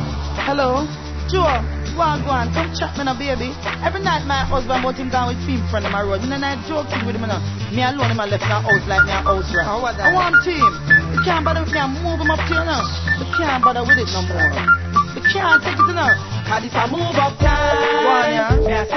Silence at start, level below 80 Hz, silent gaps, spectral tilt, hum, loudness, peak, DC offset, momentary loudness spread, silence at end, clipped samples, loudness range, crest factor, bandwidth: 0 s; -30 dBFS; none; -5.5 dB/octave; none; -18 LUFS; -2 dBFS; under 0.1%; 8 LU; 0 s; under 0.1%; 5 LU; 16 dB; 6.4 kHz